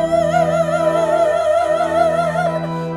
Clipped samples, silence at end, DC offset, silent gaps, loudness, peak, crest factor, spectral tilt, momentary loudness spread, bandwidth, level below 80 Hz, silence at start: under 0.1%; 0 s; under 0.1%; none; -16 LUFS; -4 dBFS; 14 dB; -6 dB/octave; 3 LU; 12.5 kHz; -46 dBFS; 0 s